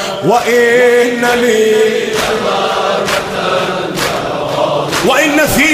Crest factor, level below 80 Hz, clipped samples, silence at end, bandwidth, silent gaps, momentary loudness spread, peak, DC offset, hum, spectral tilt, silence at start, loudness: 12 dB; -40 dBFS; under 0.1%; 0 s; 16 kHz; none; 6 LU; 0 dBFS; under 0.1%; none; -3.5 dB/octave; 0 s; -11 LUFS